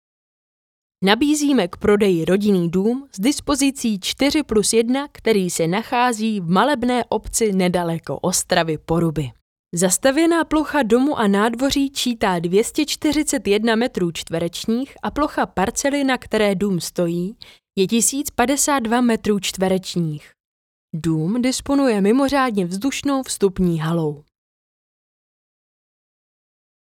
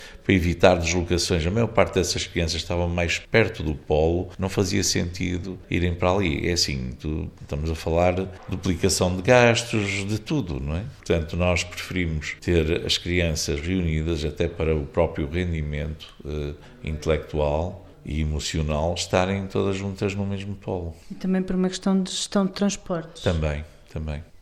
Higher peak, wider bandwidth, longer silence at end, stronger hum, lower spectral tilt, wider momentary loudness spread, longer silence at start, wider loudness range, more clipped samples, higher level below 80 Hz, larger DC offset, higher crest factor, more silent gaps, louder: about the same, 0 dBFS vs -2 dBFS; first, 18 kHz vs 14.5 kHz; first, 2.75 s vs 0.05 s; neither; about the same, -4.5 dB/octave vs -5 dB/octave; second, 7 LU vs 10 LU; first, 1 s vs 0 s; about the same, 3 LU vs 5 LU; neither; second, -46 dBFS vs -38 dBFS; neither; about the same, 20 dB vs 22 dB; first, 9.41-9.64 s, 20.40-20.88 s vs none; first, -19 LUFS vs -24 LUFS